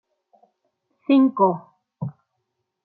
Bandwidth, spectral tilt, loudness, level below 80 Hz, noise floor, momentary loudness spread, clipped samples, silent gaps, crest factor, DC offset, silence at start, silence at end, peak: 4.3 kHz; -11.5 dB/octave; -19 LUFS; -72 dBFS; -77 dBFS; 17 LU; under 0.1%; none; 18 dB; under 0.1%; 1.1 s; 0.75 s; -6 dBFS